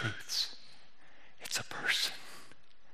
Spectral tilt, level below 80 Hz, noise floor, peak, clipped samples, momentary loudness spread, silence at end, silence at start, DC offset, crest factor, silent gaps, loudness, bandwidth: -1 dB/octave; -76 dBFS; -63 dBFS; -18 dBFS; under 0.1%; 21 LU; 0.45 s; 0 s; 0.6%; 22 dB; none; -34 LUFS; 15.5 kHz